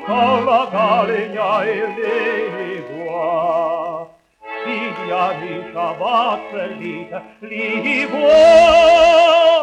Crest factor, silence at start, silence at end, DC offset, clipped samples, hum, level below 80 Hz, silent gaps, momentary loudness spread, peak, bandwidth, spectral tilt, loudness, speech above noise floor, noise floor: 16 dB; 0 s; 0 s; under 0.1%; under 0.1%; none; -48 dBFS; none; 18 LU; 0 dBFS; 9.4 kHz; -4 dB/octave; -15 LUFS; 22 dB; -37 dBFS